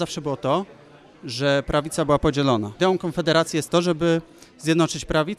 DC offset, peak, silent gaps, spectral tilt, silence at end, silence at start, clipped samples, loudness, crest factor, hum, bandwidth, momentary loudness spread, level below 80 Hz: under 0.1%; -4 dBFS; none; -5 dB/octave; 0 s; 0 s; under 0.1%; -22 LUFS; 18 dB; none; 14.5 kHz; 6 LU; -44 dBFS